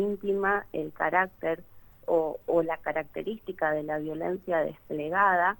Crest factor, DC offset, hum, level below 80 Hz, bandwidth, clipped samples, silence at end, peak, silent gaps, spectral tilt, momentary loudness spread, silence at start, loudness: 20 dB; under 0.1%; none; -60 dBFS; 19 kHz; under 0.1%; 0.05 s; -10 dBFS; none; -7.5 dB/octave; 10 LU; 0 s; -29 LUFS